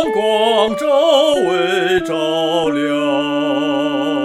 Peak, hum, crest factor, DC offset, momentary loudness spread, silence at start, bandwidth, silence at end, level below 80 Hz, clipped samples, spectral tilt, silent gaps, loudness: -2 dBFS; none; 14 dB; under 0.1%; 5 LU; 0 s; 14 kHz; 0 s; -52 dBFS; under 0.1%; -4.5 dB/octave; none; -15 LUFS